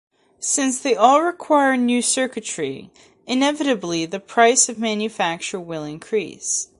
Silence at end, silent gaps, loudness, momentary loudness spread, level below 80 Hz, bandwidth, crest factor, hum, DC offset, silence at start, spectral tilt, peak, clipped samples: 0.15 s; none; -19 LUFS; 12 LU; -66 dBFS; 11.5 kHz; 20 dB; none; under 0.1%; 0.4 s; -2.5 dB/octave; 0 dBFS; under 0.1%